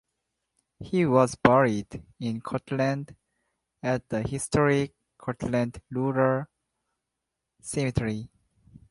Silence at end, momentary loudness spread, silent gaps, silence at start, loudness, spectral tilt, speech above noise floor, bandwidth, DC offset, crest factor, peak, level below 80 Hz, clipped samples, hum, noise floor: 0.65 s; 16 LU; none; 0.8 s; -26 LUFS; -6.5 dB/octave; 59 dB; 11.5 kHz; under 0.1%; 26 dB; -2 dBFS; -52 dBFS; under 0.1%; none; -84 dBFS